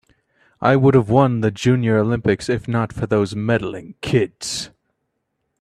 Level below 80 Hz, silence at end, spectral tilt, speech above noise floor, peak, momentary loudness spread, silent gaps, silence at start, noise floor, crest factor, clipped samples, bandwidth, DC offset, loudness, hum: -48 dBFS; 0.95 s; -6.5 dB/octave; 56 dB; 0 dBFS; 11 LU; none; 0.6 s; -74 dBFS; 18 dB; under 0.1%; 12.5 kHz; under 0.1%; -18 LUFS; none